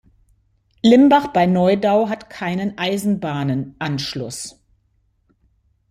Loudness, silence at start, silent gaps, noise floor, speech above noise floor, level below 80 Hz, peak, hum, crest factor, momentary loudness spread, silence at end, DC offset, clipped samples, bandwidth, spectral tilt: -18 LUFS; 0.85 s; none; -63 dBFS; 46 dB; -54 dBFS; -2 dBFS; none; 18 dB; 14 LU; 1.4 s; under 0.1%; under 0.1%; 15.5 kHz; -6 dB/octave